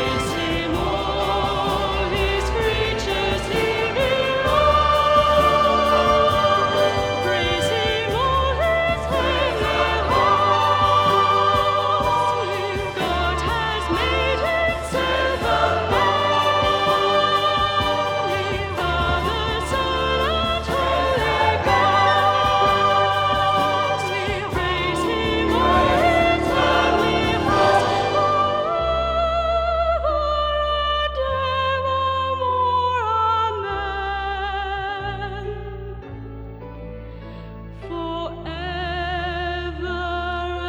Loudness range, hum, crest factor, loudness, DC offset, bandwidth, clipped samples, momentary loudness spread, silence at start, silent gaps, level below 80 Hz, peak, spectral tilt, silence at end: 9 LU; none; 16 dB; -20 LUFS; under 0.1%; 19 kHz; under 0.1%; 10 LU; 0 s; none; -34 dBFS; -4 dBFS; -5 dB/octave; 0 s